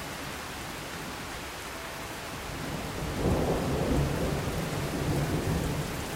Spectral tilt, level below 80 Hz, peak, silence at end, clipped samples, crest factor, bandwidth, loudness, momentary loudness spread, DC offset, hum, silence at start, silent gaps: -5 dB/octave; -40 dBFS; -16 dBFS; 0 s; under 0.1%; 16 dB; 16 kHz; -32 LUFS; 9 LU; under 0.1%; none; 0 s; none